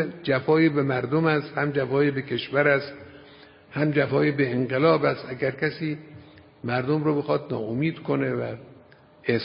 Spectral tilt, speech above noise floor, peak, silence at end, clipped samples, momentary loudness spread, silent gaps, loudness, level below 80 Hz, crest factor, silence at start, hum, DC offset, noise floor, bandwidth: -11.5 dB/octave; 29 dB; -6 dBFS; 0 s; under 0.1%; 11 LU; none; -24 LUFS; -62 dBFS; 18 dB; 0 s; none; under 0.1%; -52 dBFS; 5.4 kHz